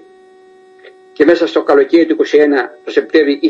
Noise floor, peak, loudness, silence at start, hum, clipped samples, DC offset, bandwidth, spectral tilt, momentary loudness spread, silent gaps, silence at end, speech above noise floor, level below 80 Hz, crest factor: -43 dBFS; 0 dBFS; -12 LUFS; 1.2 s; none; under 0.1%; under 0.1%; 7.6 kHz; -5 dB/octave; 6 LU; none; 0 s; 32 dB; -60 dBFS; 12 dB